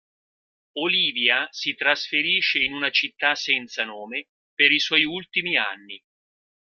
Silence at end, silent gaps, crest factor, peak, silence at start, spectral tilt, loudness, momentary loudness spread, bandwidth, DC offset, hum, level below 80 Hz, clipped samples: 0.8 s; 4.29-4.57 s; 24 dB; -2 dBFS; 0.75 s; -2 dB/octave; -21 LUFS; 14 LU; 13.5 kHz; under 0.1%; none; -68 dBFS; under 0.1%